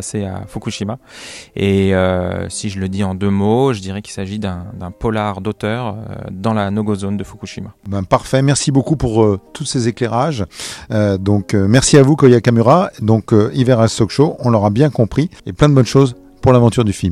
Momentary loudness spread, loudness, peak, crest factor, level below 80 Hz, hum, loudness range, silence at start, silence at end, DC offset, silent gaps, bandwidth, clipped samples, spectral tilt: 14 LU; -15 LUFS; 0 dBFS; 14 dB; -40 dBFS; none; 8 LU; 0 s; 0 s; under 0.1%; none; 13 kHz; 0.3%; -6 dB/octave